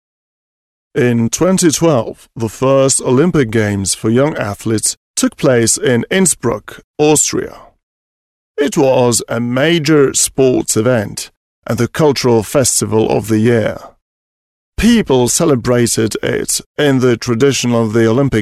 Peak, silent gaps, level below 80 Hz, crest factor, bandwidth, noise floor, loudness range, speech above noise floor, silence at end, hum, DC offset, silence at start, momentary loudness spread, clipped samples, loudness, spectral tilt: 0 dBFS; 4.97-5.14 s, 6.84-6.94 s, 7.83-8.55 s, 11.37-11.62 s, 14.02-14.72 s, 16.66-16.75 s; -40 dBFS; 12 dB; 15 kHz; under -90 dBFS; 2 LU; over 77 dB; 0 s; none; under 0.1%; 0.95 s; 10 LU; under 0.1%; -13 LUFS; -4.5 dB/octave